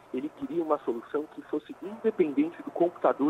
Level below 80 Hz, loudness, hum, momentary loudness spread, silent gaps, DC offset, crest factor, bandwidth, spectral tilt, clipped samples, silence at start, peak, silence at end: -74 dBFS; -30 LUFS; none; 10 LU; none; under 0.1%; 18 dB; 8.8 kHz; -8 dB/octave; under 0.1%; 0.15 s; -10 dBFS; 0 s